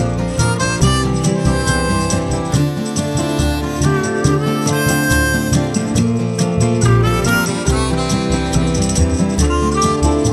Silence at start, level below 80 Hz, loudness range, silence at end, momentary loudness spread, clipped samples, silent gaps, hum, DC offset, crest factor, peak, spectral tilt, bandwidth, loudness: 0 s; -24 dBFS; 2 LU; 0 s; 4 LU; under 0.1%; none; none; under 0.1%; 14 dB; 0 dBFS; -5 dB/octave; 14 kHz; -16 LUFS